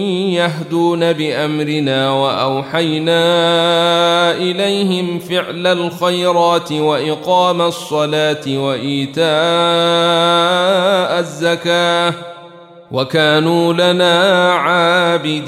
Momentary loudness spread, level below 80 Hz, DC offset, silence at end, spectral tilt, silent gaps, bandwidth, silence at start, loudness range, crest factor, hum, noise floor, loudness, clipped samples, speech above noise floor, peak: 6 LU; -62 dBFS; under 0.1%; 0 s; -5 dB/octave; none; 14.5 kHz; 0 s; 2 LU; 12 dB; none; -38 dBFS; -14 LUFS; under 0.1%; 24 dB; -2 dBFS